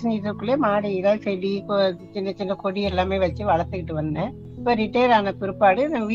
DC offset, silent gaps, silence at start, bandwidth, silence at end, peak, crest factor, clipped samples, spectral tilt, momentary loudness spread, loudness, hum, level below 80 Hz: under 0.1%; none; 0 s; 7.4 kHz; 0 s; -4 dBFS; 18 dB; under 0.1%; -7.5 dB/octave; 9 LU; -23 LUFS; none; -48 dBFS